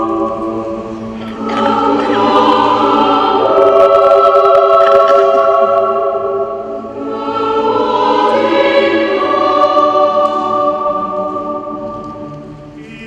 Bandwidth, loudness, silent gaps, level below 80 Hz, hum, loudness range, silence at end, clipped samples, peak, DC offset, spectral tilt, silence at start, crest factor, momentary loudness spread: 8.8 kHz; -11 LUFS; none; -46 dBFS; none; 5 LU; 0 s; 0.3%; 0 dBFS; under 0.1%; -5.5 dB/octave; 0 s; 12 dB; 16 LU